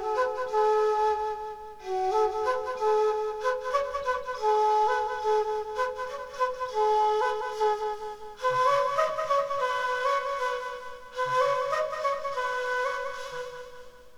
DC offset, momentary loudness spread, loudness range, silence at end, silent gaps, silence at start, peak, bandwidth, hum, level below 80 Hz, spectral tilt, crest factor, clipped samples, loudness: under 0.1%; 12 LU; 2 LU; 0 s; none; 0 s; -14 dBFS; 13.5 kHz; none; -58 dBFS; -2.5 dB/octave; 14 dB; under 0.1%; -28 LUFS